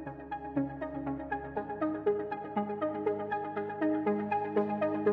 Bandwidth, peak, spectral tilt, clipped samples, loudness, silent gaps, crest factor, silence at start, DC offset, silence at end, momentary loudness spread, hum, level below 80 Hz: 4.8 kHz; -16 dBFS; -10 dB/octave; under 0.1%; -34 LUFS; none; 18 dB; 0 s; under 0.1%; 0 s; 6 LU; none; -60 dBFS